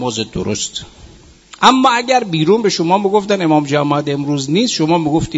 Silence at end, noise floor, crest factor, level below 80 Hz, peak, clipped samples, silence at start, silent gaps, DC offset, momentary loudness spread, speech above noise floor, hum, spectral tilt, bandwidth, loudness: 0 s; -41 dBFS; 14 dB; -44 dBFS; 0 dBFS; under 0.1%; 0 s; none; under 0.1%; 8 LU; 27 dB; none; -4.5 dB/octave; 8.2 kHz; -14 LUFS